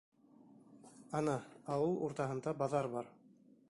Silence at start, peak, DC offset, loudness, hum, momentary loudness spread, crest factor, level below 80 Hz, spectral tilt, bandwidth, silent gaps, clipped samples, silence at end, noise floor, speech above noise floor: 0.7 s; -22 dBFS; under 0.1%; -39 LUFS; none; 14 LU; 18 dB; -74 dBFS; -7 dB/octave; 11.5 kHz; none; under 0.1%; 0.6 s; -65 dBFS; 27 dB